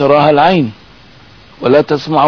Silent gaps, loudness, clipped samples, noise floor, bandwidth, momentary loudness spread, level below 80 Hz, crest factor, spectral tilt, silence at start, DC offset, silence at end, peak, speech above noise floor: none; -11 LUFS; under 0.1%; -40 dBFS; 5.4 kHz; 10 LU; -48 dBFS; 12 dB; -7.5 dB/octave; 0 s; under 0.1%; 0 s; 0 dBFS; 31 dB